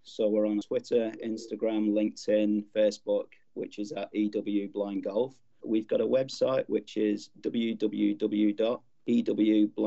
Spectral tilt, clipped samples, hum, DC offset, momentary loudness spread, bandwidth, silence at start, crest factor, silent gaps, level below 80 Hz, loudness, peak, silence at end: -6.5 dB/octave; under 0.1%; none; under 0.1%; 9 LU; 8 kHz; 0.05 s; 14 dB; none; -80 dBFS; -29 LUFS; -14 dBFS; 0 s